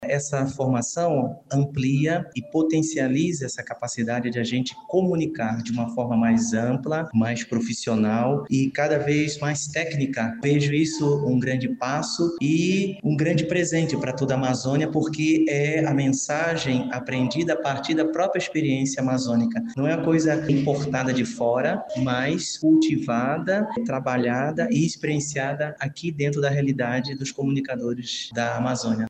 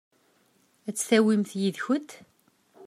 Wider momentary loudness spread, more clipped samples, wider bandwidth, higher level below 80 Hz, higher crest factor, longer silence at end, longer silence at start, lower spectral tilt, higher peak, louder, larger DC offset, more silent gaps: second, 5 LU vs 16 LU; neither; second, 9 kHz vs 15 kHz; first, -60 dBFS vs -80 dBFS; second, 14 dB vs 20 dB; about the same, 0 s vs 0 s; second, 0 s vs 0.85 s; about the same, -5.5 dB/octave vs -4.5 dB/octave; about the same, -8 dBFS vs -8 dBFS; about the same, -24 LUFS vs -26 LUFS; neither; neither